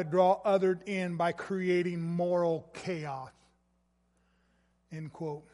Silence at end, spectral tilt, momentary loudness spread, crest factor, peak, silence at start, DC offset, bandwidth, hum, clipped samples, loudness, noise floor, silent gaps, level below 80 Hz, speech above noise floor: 0.1 s; -7 dB/octave; 17 LU; 18 dB; -14 dBFS; 0 s; under 0.1%; 11.5 kHz; none; under 0.1%; -31 LUFS; -73 dBFS; none; -72 dBFS; 42 dB